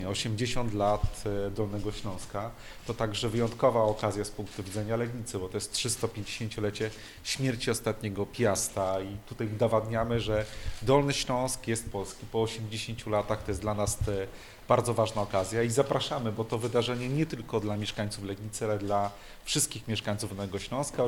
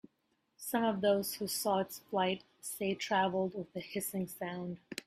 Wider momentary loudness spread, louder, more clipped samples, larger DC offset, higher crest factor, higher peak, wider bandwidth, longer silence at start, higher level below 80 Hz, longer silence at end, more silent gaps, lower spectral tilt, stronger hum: about the same, 10 LU vs 11 LU; first, -31 LUFS vs -35 LUFS; neither; neither; about the same, 20 dB vs 18 dB; first, -10 dBFS vs -18 dBFS; first, 18 kHz vs 16 kHz; second, 0 s vs 0.6 s; first, -46 dBFS vs -74 dBFS; about the same, 0 s vs 0.05 s; neither; about the same, -4.5 dB/octave vs -4 dB/octave; neither